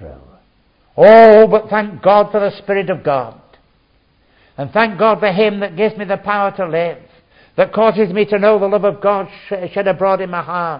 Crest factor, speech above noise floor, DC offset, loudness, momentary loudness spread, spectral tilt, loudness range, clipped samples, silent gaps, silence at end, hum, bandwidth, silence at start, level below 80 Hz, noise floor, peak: 14 dB; 43 dB; under 0.1%; -13 LUFS; 14 LU; -8.5 dB/octave; 7 LU; under 0.1%; none; 0 s; none; 5.2 kHz; 0 s; -52 dBFS; -56 dBFS; 0 dBFS